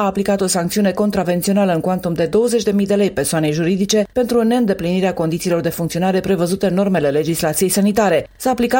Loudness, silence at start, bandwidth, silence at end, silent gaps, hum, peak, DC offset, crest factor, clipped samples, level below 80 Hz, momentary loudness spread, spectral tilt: -17 LUFS; 0 s; 17 kHz; 0 s; none; none; -2 dBFS; under 0.1%; 14 dB; under 0.1%; -46 dBFS; 3 LU; -5 dB/octave